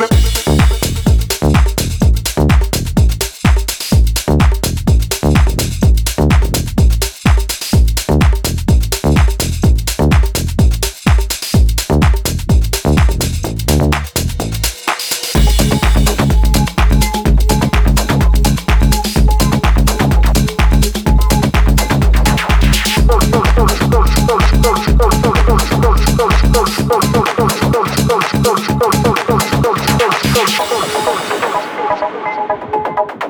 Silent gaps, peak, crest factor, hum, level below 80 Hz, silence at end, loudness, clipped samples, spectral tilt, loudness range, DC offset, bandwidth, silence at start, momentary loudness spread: none; 0 dBFS; 10 dB; none; -14 dBFS; 0 s; -13 LUFS; under 0.1%; -5 dB/octave; 2 LU; under 0.1%; over 20 kHz; 0 s; 4 LU